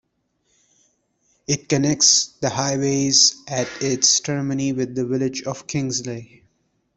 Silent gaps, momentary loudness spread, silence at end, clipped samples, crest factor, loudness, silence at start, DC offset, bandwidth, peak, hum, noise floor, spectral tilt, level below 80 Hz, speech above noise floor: none; 12 LU; 0.7 s; under 0.1%; 22 dB; -19 LUFS; 1.5 s; under 0.1%; 8.4 kHz; 0 dBFS; none; -69 dBFS; -3 dB/octave; -58 dBFS; 49 dB